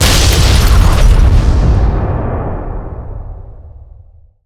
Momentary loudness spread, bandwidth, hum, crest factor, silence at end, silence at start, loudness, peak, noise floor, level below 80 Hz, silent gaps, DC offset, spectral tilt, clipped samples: 18 LU; 16 kHz; none; 10 dB; 0.75 s; 0 s; -11 LUFS; 0 dBFS; -40 dBFS; -12 dBFS; none; under 0.1%; -4.5 dB/octave; under 0.1%